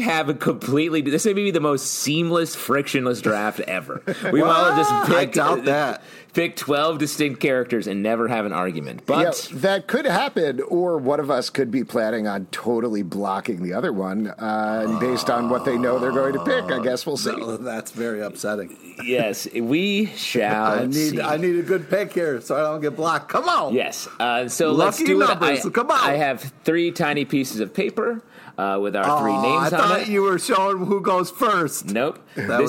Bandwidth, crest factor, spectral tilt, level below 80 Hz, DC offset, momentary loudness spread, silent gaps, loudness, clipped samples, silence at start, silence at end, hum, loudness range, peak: 17 kHz; 18 dB; -4.5 dB/octave; -68 dBFS; under 0.1%; 8 LU; none; -21 LUFS; under 0.1%; 0 s; 0 s; none; 4 LU; -4 dBFS